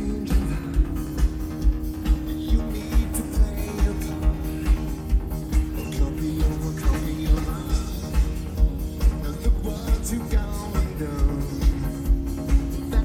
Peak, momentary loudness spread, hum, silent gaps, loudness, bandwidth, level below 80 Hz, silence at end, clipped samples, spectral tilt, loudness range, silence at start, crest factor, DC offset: -8 dBFS; 3 LU; none; none; -26 LUFS; 16 kHz; -24 dBFS; 0 s; under 0.1%; -6.5 dB/octave; 0 LU; 0 s; 16 dB; under 0.1%